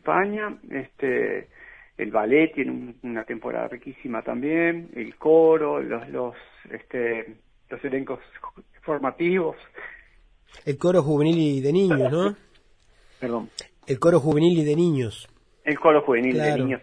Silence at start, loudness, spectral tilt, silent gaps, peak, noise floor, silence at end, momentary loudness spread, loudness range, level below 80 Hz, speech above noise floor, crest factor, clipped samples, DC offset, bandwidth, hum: 0.05 s; -23 LUFS; -7.5 dB/octave; none; -4 dBFS; -57 dBFS; 0.05 s; 20 LU; 7 LU; -58 dBFS; 34 dB; 20 dB; under 0.1%; under 0.1%; 10.5 kHz; none